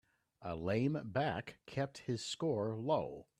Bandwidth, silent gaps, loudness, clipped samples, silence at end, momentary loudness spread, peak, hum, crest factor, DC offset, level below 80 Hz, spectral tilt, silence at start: 12.5 kHz; none; -38 LUFS; under 0.1%; 0.2 s; 9 LU; -20 dBFS; none; 18 dB; under 0.1%; -68 dBFS; -6 dB/octave; 0.4 s